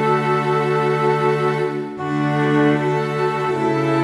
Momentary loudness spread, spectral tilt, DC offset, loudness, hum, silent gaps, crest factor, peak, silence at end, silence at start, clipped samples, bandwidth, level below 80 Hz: 5 LU; -7.5 dB/octave; under 0.1%; -19 LUFS; none; none; 12 dB; -6 dBFS; 0 s; 0 s; under 0.1%; 12 kHz; -58 dBFS